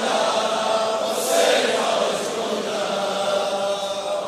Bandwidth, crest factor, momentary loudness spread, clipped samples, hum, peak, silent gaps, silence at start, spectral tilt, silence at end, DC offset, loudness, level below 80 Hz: 16 kHz; 16 dB; 7 LU; under 0.1%; none; -6 dBFS; none; 0 s; -2 dB/octave; 0 s; under 0.1%; -21 LUFS; -70 dBFS